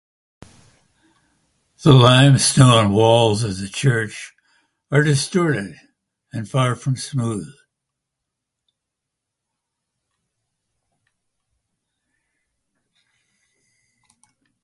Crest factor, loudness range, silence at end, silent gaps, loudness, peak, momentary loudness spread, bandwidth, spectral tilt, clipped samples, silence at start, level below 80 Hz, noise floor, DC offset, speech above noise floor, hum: 20 dB; 13 LU; 7.1 s; none; -16 LUFS; 0 dBFS; 18 LU; 11.5 kHz; -5 dB/octave; under 0.1%; 1.85 s; -52 dBFS; -82 dBFS; under 0.1%; 66 dB; none